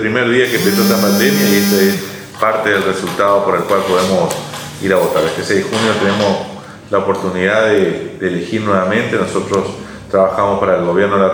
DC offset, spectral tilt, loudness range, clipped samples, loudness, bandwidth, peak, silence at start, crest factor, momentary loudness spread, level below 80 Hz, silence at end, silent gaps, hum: under 0.1%; -4.5 dB/octave; 3 LU; under 0.1%; -14 LUFS; over 20 kHz; 0 dBFS; 0 s; 14 dB; 8 LU; -50 dBFS; 0 s; none; none